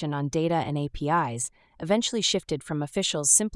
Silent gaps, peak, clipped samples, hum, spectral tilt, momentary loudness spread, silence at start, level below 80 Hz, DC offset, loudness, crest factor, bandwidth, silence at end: none; -6 dBFS; under 0.1%; none; -3.5 dB/octave; 9 LU; 0 s; -52 dBFS; under 0.1%; -26 LUFS; 20 dB; 12 kHz; 0 s